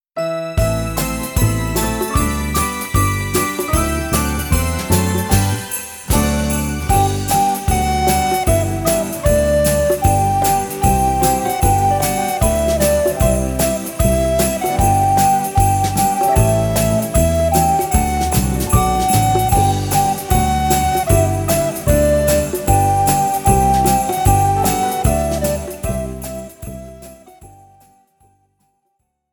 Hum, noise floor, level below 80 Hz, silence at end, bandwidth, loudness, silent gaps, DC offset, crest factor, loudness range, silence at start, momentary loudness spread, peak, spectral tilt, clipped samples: none; -69 dBFS; -24 dBFS; 1.85 s; 19.5 kHz; -16 LUFS; none; under 0.1%; 16 dB; 3 LU; 0.15 s; 5 LU; 0 dBFS; -5 dB/octave; under 0.1%